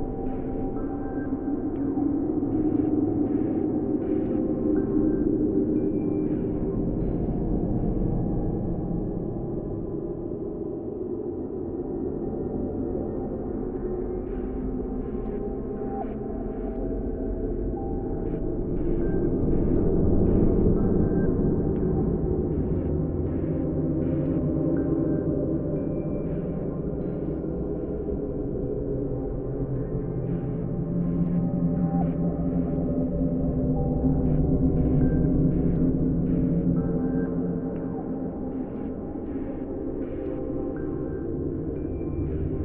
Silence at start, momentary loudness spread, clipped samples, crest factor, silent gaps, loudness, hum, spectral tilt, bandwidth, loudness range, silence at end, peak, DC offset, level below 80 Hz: 0 s; 8 LU; under 0.1%; 18 dB; none; -27 LUFS; none; -13 dB/octave; 3 kHz; 7 LU; 0 s; -8 dBFS; under 0.1%; -34 dBFS